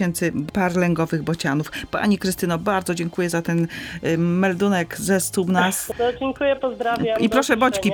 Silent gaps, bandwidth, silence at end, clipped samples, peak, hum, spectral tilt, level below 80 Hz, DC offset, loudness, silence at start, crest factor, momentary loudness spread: none; 19.5 kHz; 0 s; under 0.1%; -4 dBFS; none; -5 dB/octave; -50 dBFS; under 0.1%; -21 LUFS; 0 s; 18 dB; 5 LU